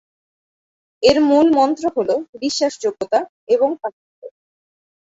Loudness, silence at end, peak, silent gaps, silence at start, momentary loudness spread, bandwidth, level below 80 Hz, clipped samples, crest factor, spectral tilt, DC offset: -17 LUFS; 0.75 s; -2 dBFS; 2.29-2.33 s, 3.29-3.47 s, 3.93-4.22 s; 1 s; 10 LU; 8 kHz; -54 dBFS; under 0.1%; 18 dB; -4 dB/octave; under 0.1%